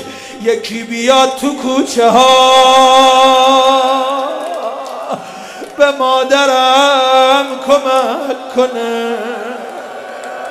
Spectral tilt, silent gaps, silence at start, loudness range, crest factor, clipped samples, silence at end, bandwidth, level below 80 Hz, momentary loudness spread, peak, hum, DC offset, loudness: -2 dB/octave; none; 0 s; 5 LU; 12 dB; 0.4%; 0 s; 16 kHz; -56 dBFS; 18 LU; 0 dBFS; none; under 0.1%; -10 LUFS